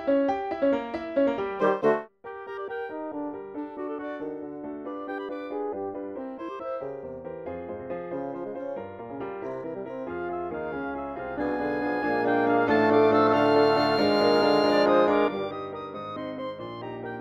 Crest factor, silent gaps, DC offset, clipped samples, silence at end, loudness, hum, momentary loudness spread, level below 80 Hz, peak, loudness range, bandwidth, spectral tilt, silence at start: 18 dB; none; under 0.1%; under 0.1%; 0 s; -27 LUFS; none; 16 LU; -60 dBFS; -8 dBFS; 14 LU; 13.5 kHz; -6.5 dB/octave; 0 s